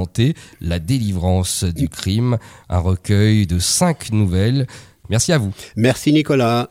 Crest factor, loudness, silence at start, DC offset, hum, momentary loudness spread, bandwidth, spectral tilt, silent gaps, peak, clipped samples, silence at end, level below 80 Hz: 14 dB; -18 LUFS; 0 s; under 0.1%; none; 8 LU; 16 kHz; -5.5 dB/octave; none; -2 dBFS; under 0.1%; 0.05 s; -36 dBFS